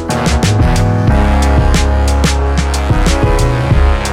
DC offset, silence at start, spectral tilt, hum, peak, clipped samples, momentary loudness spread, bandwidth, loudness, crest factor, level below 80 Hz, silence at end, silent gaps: under 0.1%; 0 s; -5.5 dB/octave; none; 0 dBFS; under 0.1%; 3 LU; 13.5 kHz; -12 LUFS; 10 dB; -12 dBFS; 0 s; none